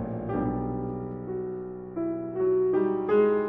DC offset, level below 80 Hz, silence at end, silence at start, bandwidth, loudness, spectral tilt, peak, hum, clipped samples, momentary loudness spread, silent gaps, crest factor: under 0.1%; -50 dBFS; 0 s; 0 s; 3.6 kHz; -28 LUFS; -8.5 dB/octave; -12 dBFS; none; under 0.1%; 11 LU; none; 14 dB